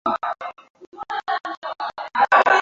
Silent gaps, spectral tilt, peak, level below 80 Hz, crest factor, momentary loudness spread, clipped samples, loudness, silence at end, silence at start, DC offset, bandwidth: 0.70-0.74 s, 0.87-0.92 s, 1.57-1.62 s; -2.5 dB/octave; -2 dBFS; -66 dBFS; 20 dB; 17 LU; under 0.1%; -22 LUFS; 0 s; 0.05 s; under 0.1%; 7.6 kHz